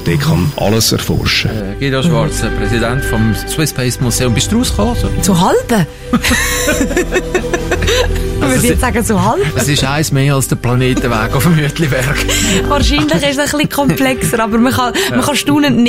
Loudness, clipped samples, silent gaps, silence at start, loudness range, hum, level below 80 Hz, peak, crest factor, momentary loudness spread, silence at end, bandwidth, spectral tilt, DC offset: -13 LUFS; under 0.1%; none; 0 s; 2 LU; none; -24 dBFS; 0 dBFS; 12 dB; 4 LU; 0 s; 16.5 kHz; -4.5 dB/octave; under 0.1%